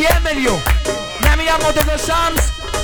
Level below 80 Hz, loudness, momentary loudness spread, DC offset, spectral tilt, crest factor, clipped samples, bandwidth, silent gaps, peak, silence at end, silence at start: -20 dBFS; -16 LUFS; 4 LU; under 0.1%; -4 dB/octave; 16 dB; under 0.1%; 19.5 kHz; none; 0 dBFS; 0 s; 0 s